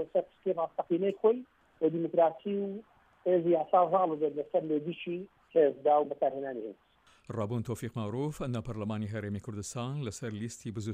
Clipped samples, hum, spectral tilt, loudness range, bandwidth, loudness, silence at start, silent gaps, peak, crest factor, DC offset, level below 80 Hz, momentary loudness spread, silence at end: under 0.1%; none; -7 dB/octave; 8 LU; 15 kHz; -32 LUFS; 0 s; none; -14 dBFS; 18 dB; under 0.1%; -64 dBFS; 12 LU; 0 s